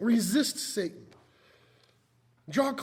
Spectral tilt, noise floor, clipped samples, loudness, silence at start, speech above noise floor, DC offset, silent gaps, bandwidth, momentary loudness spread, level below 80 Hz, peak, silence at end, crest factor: -4 dB/octave; -67 dBFS; under 0.1%; -29 LUFS; 0 s; 39 dB; under 0.1%; none; 19.5 kHz; 9 LU; -74 dBFS; -14 dBFS; 0 s; 18 dB